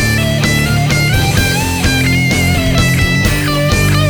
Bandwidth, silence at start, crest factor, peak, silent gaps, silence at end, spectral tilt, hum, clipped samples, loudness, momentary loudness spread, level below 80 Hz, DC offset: over 20 kHz; 0 s; 12 dB; 0 dBFS; none; 0 s; -4.5 dB/octave; none; under 0.1%; -12 LUFS; 1 LU; -22 dBFS; under 0.1%